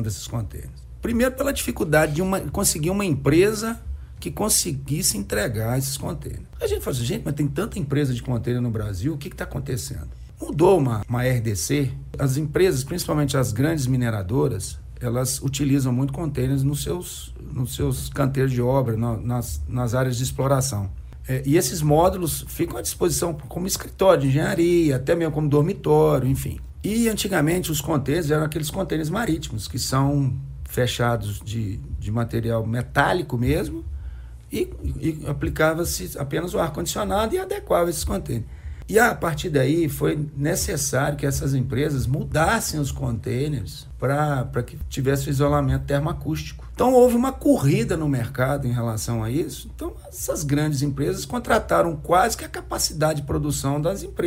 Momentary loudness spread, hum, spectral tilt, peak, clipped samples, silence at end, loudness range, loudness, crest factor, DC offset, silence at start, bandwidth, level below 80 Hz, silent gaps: 11 LU; none; -5.5 dB/octave; -4 dBFS; under 0.1%; 0 s; 4 LU; -23 LUFS; 20 dB; under 0.1%; 0 s; 16 kHz; -38 dBFS; none